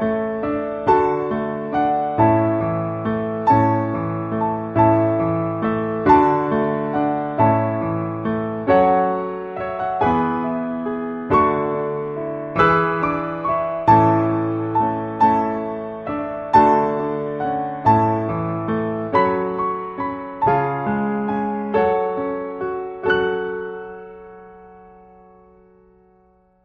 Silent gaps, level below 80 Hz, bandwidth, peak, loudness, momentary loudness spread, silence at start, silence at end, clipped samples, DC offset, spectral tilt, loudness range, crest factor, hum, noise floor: none; -48 dBFS; 6.8 kHz; -2 dBFS; -20 LUFS; 11 LU; 0 s; 1.75 s; under 0.1%; under 0.1%; -9.5 dB/octave; 5 LU; 18 dB; none; -56 dBFS